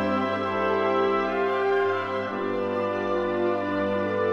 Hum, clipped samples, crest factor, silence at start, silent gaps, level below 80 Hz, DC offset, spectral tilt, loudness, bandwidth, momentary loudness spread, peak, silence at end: none; under 0.1%; 14 dB; 0 s; none; -68 dBFS; 0.2%; -7 dB/octave; -25 LUFS; 7.2 kHz; 4 LU; -12 dBFS; 0 s